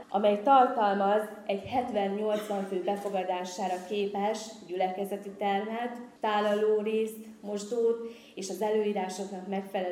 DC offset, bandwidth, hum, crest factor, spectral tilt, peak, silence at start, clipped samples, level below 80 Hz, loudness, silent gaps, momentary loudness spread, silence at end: under 0.1%; 15.5 kHz; none; 20 dB; -5 dB/octave; -8 dBFS; 0 s; under 0.1%; -74 dBFS; -30 LUFS; none; 11 LU; 0 s